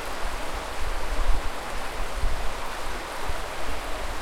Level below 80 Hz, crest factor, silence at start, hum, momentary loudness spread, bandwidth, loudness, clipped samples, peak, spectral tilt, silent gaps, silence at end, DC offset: -30 dBFS; 16 dB; 0 s; none; 3 LU; 15.5 kHz; -32 LUFS; under 0.1%; -10 dBFS; -3.5 dB/octave; none; 0 s; under 0.1%